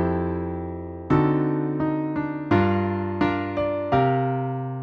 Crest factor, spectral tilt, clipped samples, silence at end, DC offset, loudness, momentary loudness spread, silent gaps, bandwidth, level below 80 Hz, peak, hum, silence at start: 16 dB; -10 dB/octave; under 0.1%; 0 s; under 0.1%; -24 LUFS; 8 LU; none; 6.2 kHz; -46 dBFS; -8 dBFS; none; 0 s